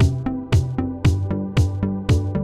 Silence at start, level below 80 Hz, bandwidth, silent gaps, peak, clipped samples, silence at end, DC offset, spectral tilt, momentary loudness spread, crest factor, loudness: 0 s; -30 dBFS; 11.5 kHz; none; -6 dBFS; under 0.1%; 0 s; 0.2%; -7.5 dB/octave; 4 LU; 14 dB; -21 LUFS